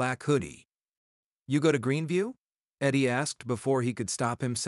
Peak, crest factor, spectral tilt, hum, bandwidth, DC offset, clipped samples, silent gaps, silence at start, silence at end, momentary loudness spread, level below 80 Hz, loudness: -14 dBFS; 16 dB; -5 dB/octave; none; 12 kHz; under 0.1%; under 0.1%; 0.88-1.44 s, 2.38-2.72 s; 0 s; 0 s; 6 LU; -66 dBFS; -29 LUFS